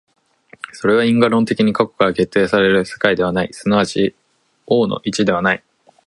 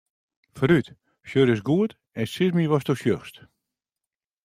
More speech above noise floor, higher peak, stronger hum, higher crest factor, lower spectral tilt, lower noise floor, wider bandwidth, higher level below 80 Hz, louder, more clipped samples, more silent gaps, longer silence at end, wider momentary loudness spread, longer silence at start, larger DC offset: second, 31 dB vs 67 dB; first, 0 dBFS vs -6 dBFS; neither; about the same, 16 dB vs 20 dB; second, -5.5 dB/octave vs -7 dB/octave; second, -47 dBFS vs -89 dBFS; second, 11.5 kHz vs 15.5 kHz; first, -50 dBFS vs -60 dBFS; first, -16 LUFS vs -24 LUFS; neither; neither; second, 0.5 s vs 1.15 s; second, 7 LU vs 10 LU; first, 0.75 s vs 0.55 s; neither